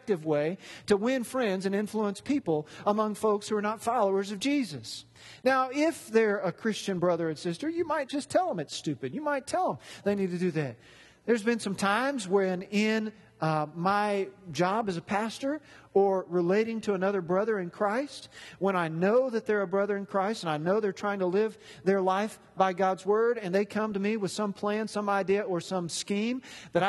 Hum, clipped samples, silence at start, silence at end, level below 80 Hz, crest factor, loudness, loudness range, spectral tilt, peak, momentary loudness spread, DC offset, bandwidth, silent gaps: none; under 0.1%; 0.05 s; 0 s; -70 dBFS; 18 dB; -29 LUFS; 2 LU; -5.5 dB/octave; -10 dBFS; 7 LU; under 0.1%; 12.5 kHz; none